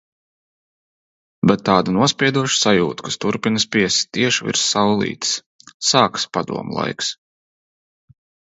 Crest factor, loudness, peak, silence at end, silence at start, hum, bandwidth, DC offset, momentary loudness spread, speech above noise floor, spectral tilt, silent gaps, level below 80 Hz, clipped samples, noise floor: 20 dB; -18 LUFS; 0 dBFS; 1.35 s; 1.45 s; none; 8 kHz; under 0.1%; 9 LU; over 72 dB; -3.5 dB/octave; 5.46-5.59 s, 5.74-5.80 s; -56 dBFS; under 0.1%; under -90 dBFS